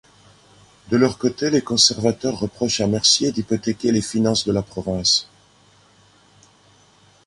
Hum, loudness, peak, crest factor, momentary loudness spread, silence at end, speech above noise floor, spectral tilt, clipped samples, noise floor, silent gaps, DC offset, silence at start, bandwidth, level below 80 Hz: 50 Hz at -45 dBFS; -19 LUFS; -2 dBFS; 20 dB; 9 LU; 2.05 s; 34 dB; -3.5 dB/octave; under 0.1%; -54 dBFS; none; under 0.1%; 0.9 s; 11.5 kHz; -50 dBFS